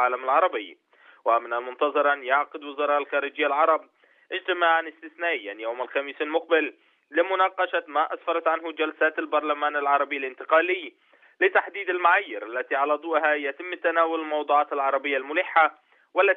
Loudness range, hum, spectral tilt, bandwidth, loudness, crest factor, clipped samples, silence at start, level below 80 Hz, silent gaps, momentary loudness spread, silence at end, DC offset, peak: 2 LU; none; -4 dB/octave; 4.1 kHz; -24 LUFS; 18 dB; under 0.1%; 0 s; -82 dBFS; none; 9 LU; 0 s; under 0.1%; -6 dBFS